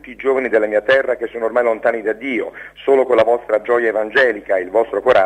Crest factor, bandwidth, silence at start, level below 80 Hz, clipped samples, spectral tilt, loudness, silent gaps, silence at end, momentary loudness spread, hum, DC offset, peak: 14 dB; 9.2 kHz; 0.05 s; -54 dBFS; under 0.1%; -5 dB/octave; -17 LUFS; none; 0 s; 7 LU; none; under 0.1%; -2 dBFS